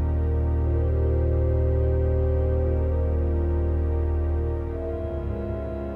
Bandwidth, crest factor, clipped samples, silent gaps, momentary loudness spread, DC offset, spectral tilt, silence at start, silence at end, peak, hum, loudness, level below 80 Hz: 2.9 kHz; 10 dB; under 0.1%; none; 7 LU; under 0.1%; -11.5 dB/octave; 0 s; 0 s; -12 dBFS; none; -25 LUFS; -26 dBFS